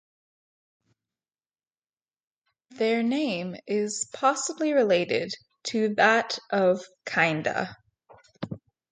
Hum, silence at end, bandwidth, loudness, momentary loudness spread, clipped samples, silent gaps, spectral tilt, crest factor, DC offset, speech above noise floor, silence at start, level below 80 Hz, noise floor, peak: none; 0.35 s; 9.6 kHz; -25 LUFS; 15 LU; under 0.1%; none; -4 dB/octave; 20 dB; under 0.1%; over 65 dB; 2.7 s; -72 dBFS; under -90 dBFS; -8 dBFS